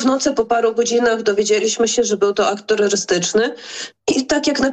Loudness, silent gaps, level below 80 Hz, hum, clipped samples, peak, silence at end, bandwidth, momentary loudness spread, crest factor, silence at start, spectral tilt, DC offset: -17 LUFS; none; -52 dBFS; none; under 0.1%; -6 dBFS; 0 s; 9.2 kHz; 4 LU; 12 dB; 0 s; -2.5 dB/octave; under 0.1%